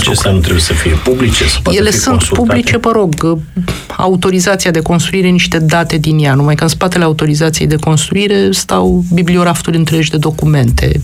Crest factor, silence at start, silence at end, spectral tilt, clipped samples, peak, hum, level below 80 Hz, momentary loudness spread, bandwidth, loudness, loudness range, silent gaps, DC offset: 10 dB; 0 s; 0 s; -5 dB/octave; under 0.1%; 0 dBFS; none; -24 dBFS; 3 LU; 16 kHz; -11 LUFS; 1 LU; none; under 0.1%